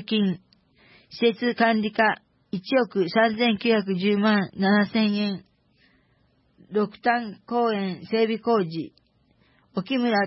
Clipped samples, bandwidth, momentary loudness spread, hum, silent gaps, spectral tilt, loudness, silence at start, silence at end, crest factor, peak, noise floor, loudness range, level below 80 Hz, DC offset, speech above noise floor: under 0.1%; 5.8 kHz; 13 LU; none; none; -9.5 dB/octave; -24 LUFS; 0 s; 0 s; 16 dB; -8 dBFS; -64 dBFS; 4 LU; -70 dBFS; under 0.1%; 41 dB